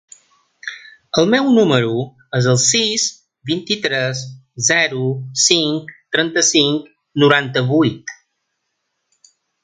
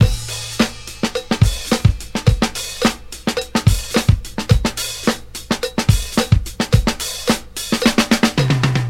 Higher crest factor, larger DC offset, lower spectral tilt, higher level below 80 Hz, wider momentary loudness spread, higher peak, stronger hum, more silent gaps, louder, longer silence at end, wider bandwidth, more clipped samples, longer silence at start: about the same, 18 dB vs 18 dB; neither; second, -3.5 dB/octave vs -5 dB/octave; second, -60 dBFS vs -26 dBFS; first, 18 LU vs 7 LU; about the same, 0 dBFS vs 0 dBFS; neither; neither; about the same, -16 LUFS vs -18 LUFS; first, 1.5 s vs 0 s; second, 9.6 kHz vs 16.5 kHz; neither; first, 0.65 s vs 0 s